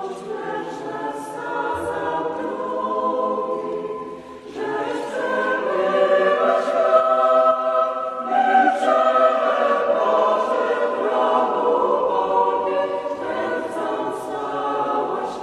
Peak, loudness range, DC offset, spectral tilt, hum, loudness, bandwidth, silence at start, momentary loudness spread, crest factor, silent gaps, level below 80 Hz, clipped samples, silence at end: -4 dBFS; 7 LU; under 0.1%; -4.5 dB/octave; none; -20 LUFS; 12 kHz; 0 s; 12 LU; 18 dB; none; -62 dBFS; under 0.1%; 0 s